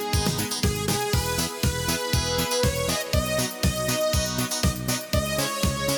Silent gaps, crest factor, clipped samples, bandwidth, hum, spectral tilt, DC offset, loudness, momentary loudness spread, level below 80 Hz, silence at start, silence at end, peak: none; 14 dB; under 0.1%; 19.5 kHz; none; -3.5 dB/octave; under 0.1%; -24 LUFS; 2 LU; -36 dBFS; 0 s; 0 s; -10 dBFS